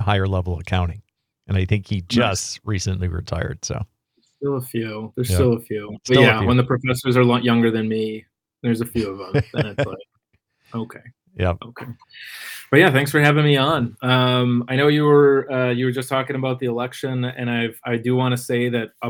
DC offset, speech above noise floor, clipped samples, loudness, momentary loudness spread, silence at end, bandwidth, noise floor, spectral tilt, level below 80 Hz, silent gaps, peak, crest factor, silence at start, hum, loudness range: under 0.1%; 49 dB; under 0.1%; -20 LUFS; 16 LU; 0 s; 19.5 kHz; -68 dBFS; -6 dB/octave; -48 dBFS; none; 0 dBFS; 20 dB; 0 s; none; 9 LU